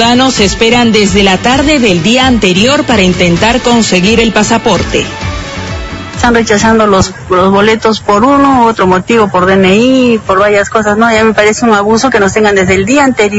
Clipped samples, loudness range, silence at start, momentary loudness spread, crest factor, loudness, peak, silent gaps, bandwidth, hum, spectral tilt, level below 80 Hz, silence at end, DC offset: 1%; 3 LU; 0 s; 4 LU; 8 dB; -7 LUFS; 0 dBFS; none; 11 kHz; none; -4.5 dB/octave; -28 dBFS; 0 s; under 0.1%